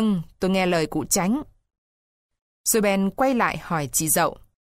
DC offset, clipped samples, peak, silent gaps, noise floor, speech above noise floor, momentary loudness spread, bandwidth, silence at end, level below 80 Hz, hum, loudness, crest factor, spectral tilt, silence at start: under 0.1%; under 0.1%; -8 dBFS; 1.78-2.29 s, 2.42-2.64 s; under -90 dBFS; over 68 dB; 6 LU; 16 kHz; 0.4 s; -50 dBFS; none; -22 LUFS; 16 dB; -4 dB/octave; 0 s